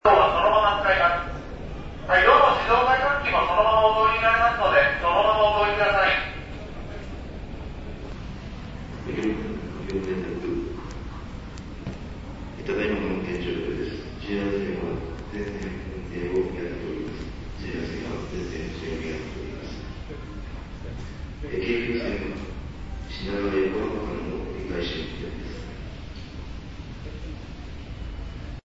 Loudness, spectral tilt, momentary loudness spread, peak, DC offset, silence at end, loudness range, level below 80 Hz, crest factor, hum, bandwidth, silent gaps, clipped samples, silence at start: -24 LUFS; -6 dB/octave; 19 LU; -2 dBFS; under 0.1%; 0.1 s; 14 LU; -38 dBFS; 22 dB; none; 8 kHz; none; under 0.1%; 0.05 s